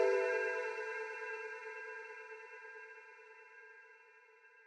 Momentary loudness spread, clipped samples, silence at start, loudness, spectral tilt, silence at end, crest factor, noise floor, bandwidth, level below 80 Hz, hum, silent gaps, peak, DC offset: 24 LU; under 0.1%; 0 s; -41 LUFS; -1.5 dB/octave; 0.05 s; 22 dB; -63 dBFS; 10 kHz; under -90 dBFS; none; none; -20 dBFS; under 0.1%